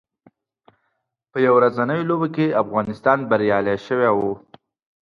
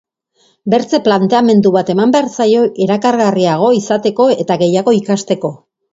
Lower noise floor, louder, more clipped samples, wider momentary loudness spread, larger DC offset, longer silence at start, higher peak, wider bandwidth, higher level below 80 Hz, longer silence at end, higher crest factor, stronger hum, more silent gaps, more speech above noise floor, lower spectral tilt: first, -74 dBFS vs -56 dBFS; second, -19 LUFS vs -12 LUFS; neither; about the same, 7 LU vs 5 LU; neither; first, 1.35 s vs 0.65 s; about the same, -2 dBFS vs 0 dBFS; second, 6.8 kHz vs 7.8 kHz; about the same, -60 dBFS vs -58 dBFS; first, 0.65 s vs 0.35 s; first, 18 dB vs 12 dB; neither; neither; first, 55 dB vs 45 dB; first, -8.5 dB/octave vs -6 dB/octave